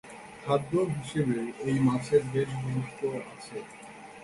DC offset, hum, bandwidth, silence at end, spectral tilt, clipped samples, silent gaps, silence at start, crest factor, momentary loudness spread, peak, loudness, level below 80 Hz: under 0.1%; none; 11.5 kHz; 0 s; -7 dB/octave; under 0.1%; none; 0.05 s; 18 dB; 16 LU; -12 dBFS; -29 LUFS; -62 dBFS